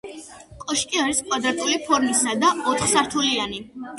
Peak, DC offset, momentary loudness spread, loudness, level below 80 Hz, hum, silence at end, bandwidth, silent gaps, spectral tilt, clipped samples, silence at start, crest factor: -6 dBFS; under 0.1%; 13 LU; -21 LUFS; -54 dBFS; none; 0 s; 12 kHz; none; -1.5 dB/octave; under 0.1%; 0.05 s; 18 dB